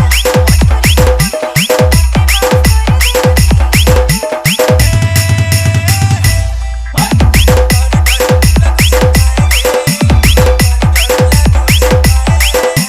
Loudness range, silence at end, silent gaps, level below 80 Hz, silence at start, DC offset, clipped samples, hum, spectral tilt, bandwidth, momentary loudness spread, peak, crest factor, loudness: 1 LU; 0 s; none; -12 dBFS; 0 s; under 0.1%; 0.2%; none; -4.5 dB/octave; 16.5 kHz; 3 LU; 0 dBFS; 8 dB; -9 LUFS